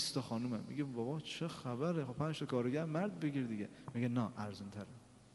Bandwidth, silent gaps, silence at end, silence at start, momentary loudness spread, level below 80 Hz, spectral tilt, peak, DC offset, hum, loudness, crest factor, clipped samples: 11.5 kHz; none; 0.05 s; 0 s; 9 LU; -74 dBFS; -6 dB/octave; -24 dBFS; under 0.1%; none; -40 LUFS; 16 dB; under 0.1%